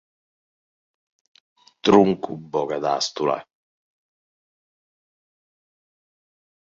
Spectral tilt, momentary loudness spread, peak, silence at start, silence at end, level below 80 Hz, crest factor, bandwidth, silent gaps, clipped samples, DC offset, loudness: -5 dB/octave; 12 LU; -2 dBFS; 1.85 s; 3.35 s; -62 dBFS; 24 dB; 7.8 kHz; none; under 0.1%; under 0.1%; -21 LUFS